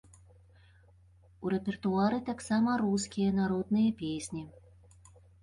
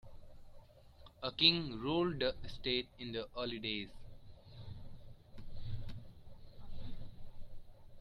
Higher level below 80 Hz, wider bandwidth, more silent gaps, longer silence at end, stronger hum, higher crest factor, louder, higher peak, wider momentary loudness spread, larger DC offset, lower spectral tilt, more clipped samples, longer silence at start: second, -60 dBFS vs -52 dBFS; first, 11.5 kHz vs 6.4 kHz; neither; first, 0.9 s vs 0 s; neither; second, 16 dB vs 28 dB; first, -31 LUFS vs -36 LUFS; second, -16 dBFS vs -12 dBFS; second, 11 LU vs 29 LU; neither; about the same, -6 dB/octave vs -6.5 dB/octave; neither; first, 1.4 s vs 0.05 s